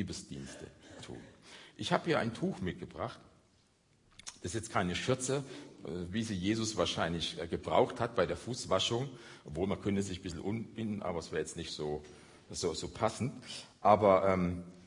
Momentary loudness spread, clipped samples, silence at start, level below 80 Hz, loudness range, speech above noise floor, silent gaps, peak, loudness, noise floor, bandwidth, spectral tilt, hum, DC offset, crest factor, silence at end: 18 LU; under 0.1%; 0 s; -62 dBFS; 5 LU; 35 dB; none; -12 dBFS; -34 LUFS; -69 dBFS; 11 kHz; -5 dB/octave; none; under 0.1%; 24 dB; 0 s